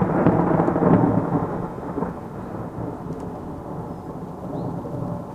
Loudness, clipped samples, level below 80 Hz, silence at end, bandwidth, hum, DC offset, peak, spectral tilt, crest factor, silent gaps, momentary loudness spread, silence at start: -24 LUFS; under 0.1%; -44 dBFS; 0 s; 8.6 kHz; none; under 0.1%; -4 dBFS; -10 dB/octave; 20 dB; none; 15 LU; 0 s